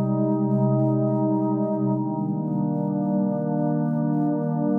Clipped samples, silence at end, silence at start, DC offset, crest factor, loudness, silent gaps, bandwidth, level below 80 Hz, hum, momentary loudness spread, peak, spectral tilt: under 0.1%; 0 s; 0 s; under 0.1%; 10 dB; -23 LUFS; none; 2 kHz; -76 dBFS; none; 4 LU; -12 dBFS; -14 dB/octave